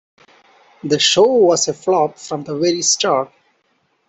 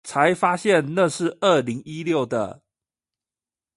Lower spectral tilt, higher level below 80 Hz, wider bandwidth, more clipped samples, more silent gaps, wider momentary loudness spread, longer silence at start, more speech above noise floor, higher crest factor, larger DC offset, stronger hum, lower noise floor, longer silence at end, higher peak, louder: second, -2.5 dB/octave vs -5 dB/octave; about the same, -62 dBFS vs -66 dBFS; second, 8.4 kHz vs 11.5 kHz; neither; neither; first, 14 LU vs 10 LU; first, 0.85 s vs 0.05 s; second, 48 dB vs over 69 dB; about the same, 16 dB vs 18 dB; neither; neither; second, -64 dBFS vs under -90 dBFS; second, 0.8 s vs 1.25 s; about the same, -2 dBFS vs -4 dBFS; first, -15 LUFS vs -21 LUFS